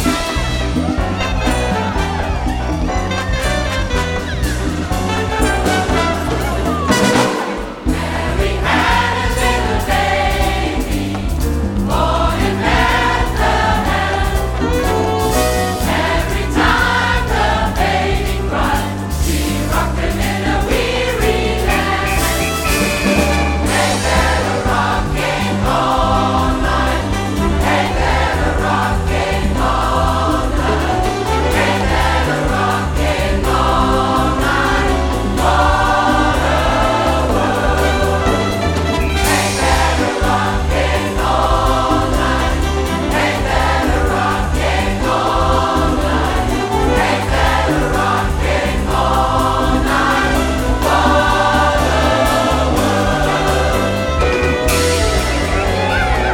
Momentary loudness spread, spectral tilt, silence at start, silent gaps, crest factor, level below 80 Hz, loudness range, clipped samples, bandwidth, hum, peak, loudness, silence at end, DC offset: 5 LU; -5 dB/octave; 0 s; none; 14 dB; -22 dBFS; 3 LU; under 0.1%; 18.5 kHz; none; 0 dBFS; -15 LUFS; 0 s; under 0.1%